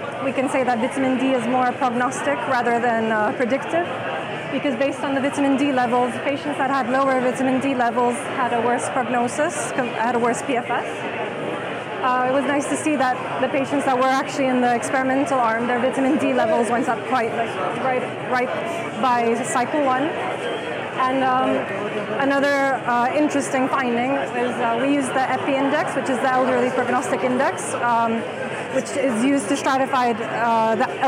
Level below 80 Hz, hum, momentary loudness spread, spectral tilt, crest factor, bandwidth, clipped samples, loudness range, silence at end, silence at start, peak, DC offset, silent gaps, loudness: -68 dBFS; none; 6 LU; -4.5 dB/octave; 14 dB; 14.5 kHz; under 0.1%; 2 LU; 0 s; 0 s; -8 dBFS; under 0.1%; none; -21 LUFS